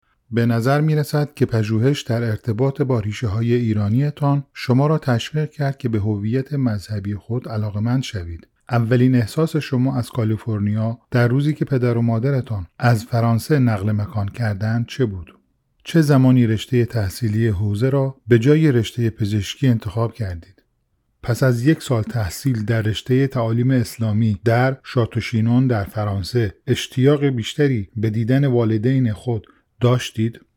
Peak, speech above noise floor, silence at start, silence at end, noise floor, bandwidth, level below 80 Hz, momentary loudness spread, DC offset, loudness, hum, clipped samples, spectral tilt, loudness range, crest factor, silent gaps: -2 dBFS; 49 dB; 0.3 s; 0.2 s; -67 dBFS; 16 kHz; -50 dBFS; 7 LU; under 0.1%; -20 LUFS; none; under 0.1%; -7.5 dB/octave; 3 LU; 18 dB; none